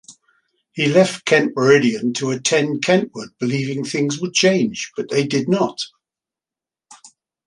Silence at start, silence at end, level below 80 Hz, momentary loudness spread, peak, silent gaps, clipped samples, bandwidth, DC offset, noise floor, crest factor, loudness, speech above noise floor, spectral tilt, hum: 0.1 s; 0.4 s; -64 dBFS; 10 LU; -2 dBFS; none; under 0.1%; 11.5 kHz; under 0.1%; -90 dBFS; 18 dB; -18 LUFS; 72 dB; -4.5 dB/octave; none